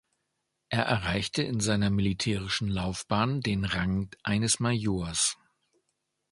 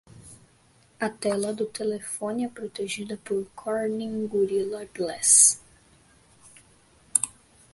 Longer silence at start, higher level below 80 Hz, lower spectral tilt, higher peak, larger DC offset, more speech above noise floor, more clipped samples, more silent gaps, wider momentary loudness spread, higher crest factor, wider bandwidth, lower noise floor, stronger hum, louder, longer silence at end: first, 0.7 s vs 0.15 s; first, -48 dBFS vs -66 dBFS; first, -4 dB/octave vs -2 dB/octave; second, -8 dBFS vs 0 dBFS; neither; first, 52 dB vs 34 dB; neither; neither; second, 5 LU vs 16 LU; about the same, 22 dB vs 26 dB; about the same, 11.5 kHz vs 12 kHz; first, -80 dBFS vs -60 dBFS; neither; second, -28 LUFS vs -24 LUFS; first, 1 s vs 0.45 s